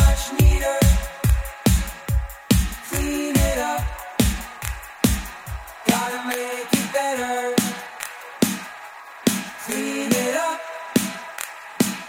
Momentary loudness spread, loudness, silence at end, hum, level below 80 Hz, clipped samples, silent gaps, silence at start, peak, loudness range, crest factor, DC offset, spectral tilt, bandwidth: 13 LU; -23 LUFS; 0 s; none; -26 dBFS; under 0.1%; none; 0 s; -2 dBFS; 3 LU; 20 dB; under 0.1%; -4.5 dB/octave; 17 kHz